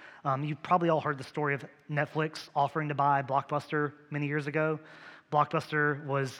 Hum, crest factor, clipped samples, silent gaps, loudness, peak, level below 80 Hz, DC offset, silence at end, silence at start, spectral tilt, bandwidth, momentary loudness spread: none; 18 dB; under 0.1%; none; -31 LUFS; -12 dBFS; -80 dBFS; under 0.1%; 0 s; 0 s; -7 dB/octave; 11.5 kHz; 7 LU